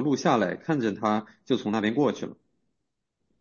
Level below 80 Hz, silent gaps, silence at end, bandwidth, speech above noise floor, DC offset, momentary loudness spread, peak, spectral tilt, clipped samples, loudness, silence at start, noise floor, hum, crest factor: -70 dBFS; none; 1.05 s; 7.2 kHz; 55 dB; under 0.1%; 7 LU; -8 dBFS; -6 dB/octave; under 0.1%; -26 LUFS; 0 s; -81 dBFS; none; 20 dB